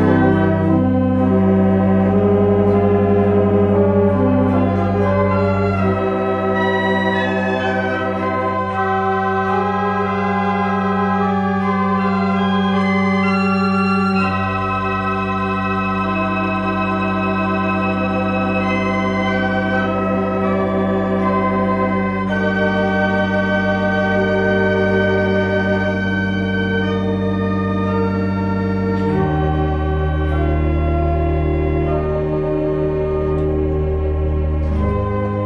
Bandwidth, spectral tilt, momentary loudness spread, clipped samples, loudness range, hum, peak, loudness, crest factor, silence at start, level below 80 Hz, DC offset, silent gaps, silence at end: 6.6 kHz; -8.5 dB/octave; 4 LU; under 0.1%; 4 LU; none; -2 dBFS; -17 LUFS; 14 dB; 0 s; -30 dBFS; under 0.1%; none; 0 s